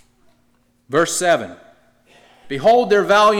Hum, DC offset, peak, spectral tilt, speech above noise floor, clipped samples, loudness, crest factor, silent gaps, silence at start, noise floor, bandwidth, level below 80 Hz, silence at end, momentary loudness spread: none; under 0.1%; -6 dBFS; -3.5 dB/octave; 45 dB; under 0.1%; -16 LUFS; 12 dB; none; 0.9 s; -60 dBFS; 17 kHz; -60 dBFS; 0 s; 12 LU